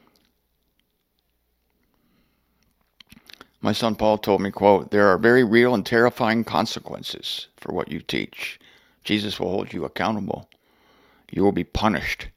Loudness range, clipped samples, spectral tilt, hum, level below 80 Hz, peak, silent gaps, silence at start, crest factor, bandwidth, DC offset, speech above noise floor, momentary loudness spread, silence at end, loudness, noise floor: 9 LU; under 0.1%; -5.5 dB/octave; none; -48 dBFS; 0 dBFS; none; 3.65 s; 22 dB; 16 kHz; under 0.1%; 50 dB; 14 LU; 0.05 s; -22 LUFS; -71 dBFS